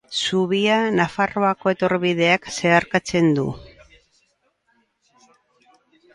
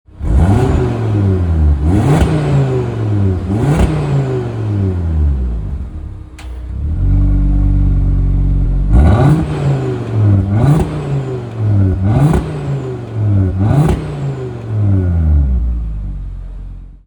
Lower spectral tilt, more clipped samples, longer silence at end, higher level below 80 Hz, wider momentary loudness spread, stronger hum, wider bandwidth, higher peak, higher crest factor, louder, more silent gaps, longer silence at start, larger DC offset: second, -5 dB/octave vs -9 dB/octave; neither; first, 2.5 s vs 0.1 s; second, -56 dBFS vs -18 dBFS; second, 4 LU vs 12 LU; neither; second, 11.5 kHz vs 19 kHz; about the same, -2 dBFS vs 0 dBFS; first, 20 dB vs 12 dB; second, -19 LUFS vs -14 LUFS; neither; about the same, 0.1 s vs 0.15 s; neither